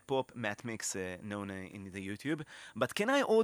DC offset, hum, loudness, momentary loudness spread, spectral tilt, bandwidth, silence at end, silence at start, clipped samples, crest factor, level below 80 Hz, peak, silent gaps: under 0.1%; none; -36 LUFS; 13 LU; -4 dB/octave; 19 kHz; 0 s; 0.1 s; under 0.1%; 20 dB; -74 dBFS; -16 dBFS; none